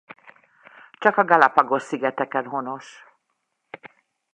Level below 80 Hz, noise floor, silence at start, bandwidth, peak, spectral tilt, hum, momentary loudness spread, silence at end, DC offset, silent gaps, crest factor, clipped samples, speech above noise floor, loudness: -72 dBFS; -75 dBFS; 1 s; 9.6 kHz; 0 dBFS; -5.5 dB/octave; none; 25 LU; 0.45 s; under 0.1%; none; 24 dB; under 0.1%; 55 dB; -20 LUFS